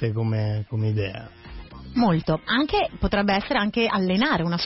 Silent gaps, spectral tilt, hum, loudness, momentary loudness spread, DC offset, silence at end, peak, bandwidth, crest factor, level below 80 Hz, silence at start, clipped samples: none; -9.5 dB/octave; none; -23 LUFS; 16 LU; under 0.1%; 0 s; -8 dBFS; 6 kHz; 14 dB; -42 dBFS; 0 s; under 0.1%